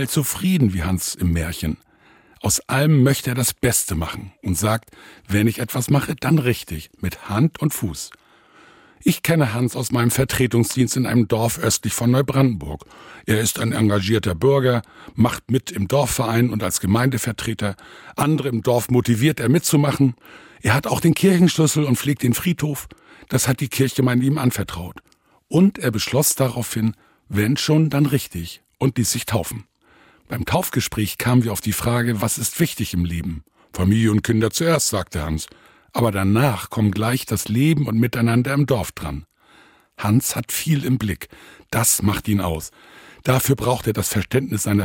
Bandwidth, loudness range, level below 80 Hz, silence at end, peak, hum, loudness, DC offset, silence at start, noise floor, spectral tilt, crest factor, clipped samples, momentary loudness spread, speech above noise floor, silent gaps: 17 kHz; 3 LU; -44 dBFS; 0 s; -4 dBFS; none; -20 LUFS; under 0.1%; 0 s; -54 dBFS; -5 dB/octave; 16 dB; under 0.1%; 11 LU; 34 dB; none